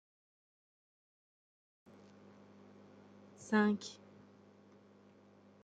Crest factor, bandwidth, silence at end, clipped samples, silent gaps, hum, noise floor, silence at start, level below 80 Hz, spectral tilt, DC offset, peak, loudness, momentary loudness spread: 26 dB; 9 kHz; 1.7 s; under 0.1%; none; 50 Hz at -65 dBFS; -63 dBFS; 3.4 s; -90 dBFS; -5.5 dB/octave; under 0.1%; -18 dBFS; -35 LUFS; 28 LU